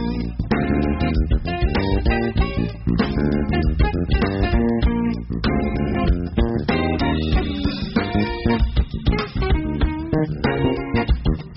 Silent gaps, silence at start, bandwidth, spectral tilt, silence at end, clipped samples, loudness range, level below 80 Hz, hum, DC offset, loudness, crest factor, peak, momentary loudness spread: none; 0 s; 5.8 kHz; -6 dB/octave; 0 s; under 0.1%; 1 LU; -24 dBFS; none; under 0.1%; -21 LUFS; 14 dB; -4 dBFS; 3 LU